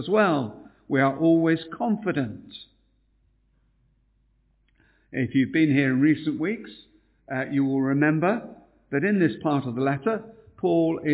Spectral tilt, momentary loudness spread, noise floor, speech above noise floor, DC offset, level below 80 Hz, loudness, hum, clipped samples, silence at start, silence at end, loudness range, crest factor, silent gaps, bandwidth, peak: -11 dB/octave; 13 LU; -66 dBFS; 42 dB; under 0.1%; -62 dBFS; -24 LUFS; none; under 0.1%; 0 s; 0 s; 9 LU; 18 dB; none; 4 kHz; -8 dBFS